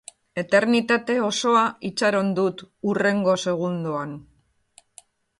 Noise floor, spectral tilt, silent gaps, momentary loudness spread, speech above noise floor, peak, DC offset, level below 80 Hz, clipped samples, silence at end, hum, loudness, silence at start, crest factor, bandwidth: -58 dBFS; -5 dB/octave; none; 11 LU; 36 dB; -6 dBFS; under 0.1%; -66 dBFS; under 0.1%; 1.15 s; none; -22 LUFS; 0.35 s; 18 dB; 11.5 kHz